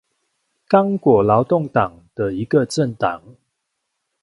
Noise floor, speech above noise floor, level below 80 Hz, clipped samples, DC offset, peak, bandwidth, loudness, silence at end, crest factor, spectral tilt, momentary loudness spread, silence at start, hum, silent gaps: -76 dBFS; 58 dB; -52 dBFS; under 0.1%; under 0.1%; 0 dBFS; 11.5 kHz; -18 LUFS; 0.9 s; 18 dB; -7 dB/octave; 10 LU; 0.7 s; none; none